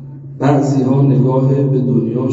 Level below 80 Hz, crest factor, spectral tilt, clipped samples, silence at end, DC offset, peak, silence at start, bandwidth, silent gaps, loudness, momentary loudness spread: -54 dBFS; 12 dB; -9.5 dB/octave; under 0.1%; 0 s; under 0.1%; 0 dBFS; 0 s; 7.6 kHz; none; -14 LUFS; 4 LU